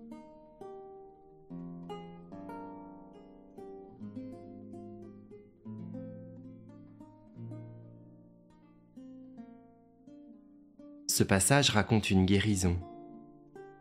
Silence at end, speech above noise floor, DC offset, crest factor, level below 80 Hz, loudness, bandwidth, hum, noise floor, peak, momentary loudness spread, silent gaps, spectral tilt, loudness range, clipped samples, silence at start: 0.05 s; 33 dB; under 0.1%; 26 dB; -60 dBFS; -30 LUFS; 15 kHz; none; -60 dBFS; -10 dBFS; 27 LU; none; -4.5 dB/octave; 23 LU; under 0.1%; 0 s